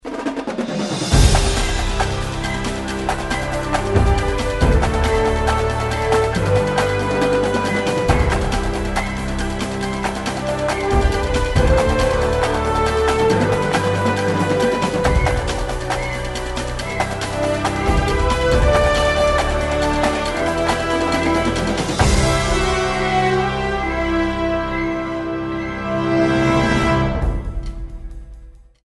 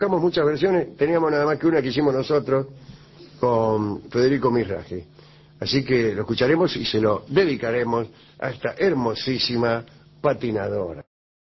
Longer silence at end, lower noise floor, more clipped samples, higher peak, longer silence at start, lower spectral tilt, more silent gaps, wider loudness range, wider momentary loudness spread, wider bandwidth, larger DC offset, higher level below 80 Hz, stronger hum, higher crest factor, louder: second, 0.3 s vs 0.5 s; second, -40 dBFS vs -45 dBFS; neither; first, -2 dBFS vs -8 dBFS; about the same, 0.05 s vs 0 s; second, -5 dB/octave vs -7 dB/octave; neither; about the same, 3 LU vs 2 LU; about the same, 8 LU vs 9 LU; first, 12 kHz vs 6 kHz; neither; first, -24 dBFS vs -52 dBFS; neither; about the same, 16 dB vs 16 dB; first, -19 LUFS vs -22 LUFS